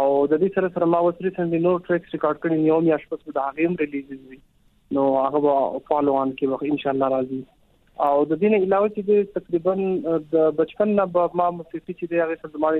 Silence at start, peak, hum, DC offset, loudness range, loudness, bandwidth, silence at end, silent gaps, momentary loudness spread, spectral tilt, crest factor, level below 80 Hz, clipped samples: 0 s; -6 dBFS; none; under 0.1%; 2 LU; -22 LUFS; 4.1 kHz; 0 s; none; 7 LU; -10 dB/octave; 16 dB; -60 dBFS; under 0.1%